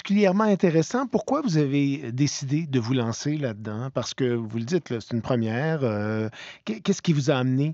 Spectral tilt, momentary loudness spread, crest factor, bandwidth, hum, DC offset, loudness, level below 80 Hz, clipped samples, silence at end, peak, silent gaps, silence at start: -6.5 dB/octave; 9 LU; 18 dB; 8 kHz; none; under 0.1%; -25 LUFS; -66 dBFS; under 0.1%; 0 s; -6 dBFS; none; 0.05 s